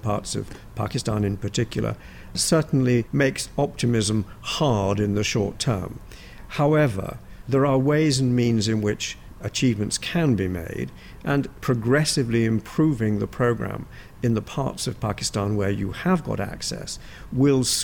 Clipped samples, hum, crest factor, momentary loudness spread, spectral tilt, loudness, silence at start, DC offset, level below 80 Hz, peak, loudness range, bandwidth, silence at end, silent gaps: under 0.1%; none; 14 dB; 13 LU; -5 dB/octave; -23 LUFS; 0.05 s; under 0.1%; -44 dBFS; -8 dBFS; 3 LU; 18 kHz; 0 s; none